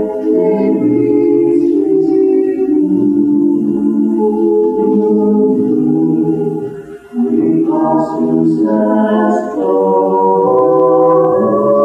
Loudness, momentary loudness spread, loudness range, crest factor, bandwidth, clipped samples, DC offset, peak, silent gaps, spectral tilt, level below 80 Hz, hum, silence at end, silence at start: -12 LUFS; 4 LU; 2 LU; 12 dB; 7.4 kHz; under 0.1%; under 0.1%; 0 dBFS; none; -10 dB/octave; -54 dBFS; none; 0 s; 0 s